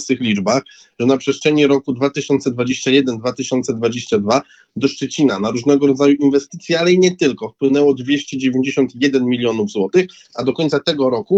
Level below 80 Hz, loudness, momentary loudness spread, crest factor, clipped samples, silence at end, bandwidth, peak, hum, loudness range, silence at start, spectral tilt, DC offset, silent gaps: -60 dBFS; -16 LUFS; 7 LU; 14 dB; under 0.1%; 0 s; 8.2 kHz; -2 dBFS; none; 3 LU; 0 s; -5 dB/octave; under 0.1%; none